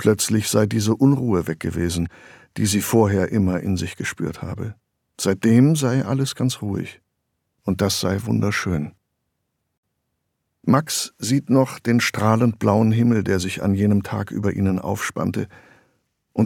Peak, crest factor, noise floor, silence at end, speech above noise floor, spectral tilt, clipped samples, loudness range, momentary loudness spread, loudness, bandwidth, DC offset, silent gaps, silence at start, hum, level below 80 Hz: -2 dBFS; 20 dB; -75 dBFS; 0 s; 55 dB; -5.5 dB/octave; under 0.1%; 6 LU; 11 LU; -21 LUFS; 18.5 kHz; under 0.1%; 9.77-9.83 s; 0 s; none; -50 dBFS